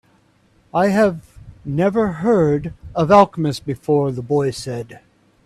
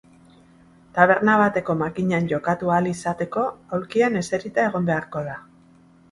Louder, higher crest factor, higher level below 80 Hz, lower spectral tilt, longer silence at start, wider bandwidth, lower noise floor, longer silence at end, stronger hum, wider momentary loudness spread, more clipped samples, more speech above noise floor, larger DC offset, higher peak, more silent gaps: first, -18 LUFS vs -22 LUFS; about the same, 18 dB vs 22 dB; first, -48 dBFS vs -58 dBFS; about the same, -7 dB/octave vs -6.5 dB/octave; second, 0.75 s vs 0.95 s; first, 13.5 kHz vs 11.5 kHz; first, -57 dBFS vs -53 dBFS; second, 0.45 s vs 0.7 s; neither; about the same, 15 LU vs 13 LU; neither; first, 39 dB vs 31 dB; neither; about the same, 0 dBFS vs -2 dBFS; neither